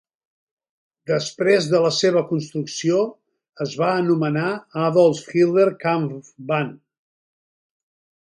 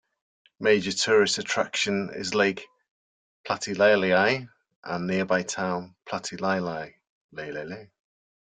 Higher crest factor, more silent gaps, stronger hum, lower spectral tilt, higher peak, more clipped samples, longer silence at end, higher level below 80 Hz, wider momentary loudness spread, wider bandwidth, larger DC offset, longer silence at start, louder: about the same, 18 dB vs 20 dB; second, 3.49-3.53 s vs 2.88-3.44 s, 4.76-4.83 s, 7.09-7.29 s; neither; first, -5.5 dB/octave vs -3.5 dB/octave; first, -4 dBFS vs -8 dBFS; neither; first, 1.55 s vs 0.7 s; about the same, -68 dBFS vs -68 dBFS; second, 11 LU vs 18 LU; first, 11.5 kHz vs 9.6 kHz; neither; first, 1.1 s vs 0.6 s; first, -20 LUFS vs -25 LUFS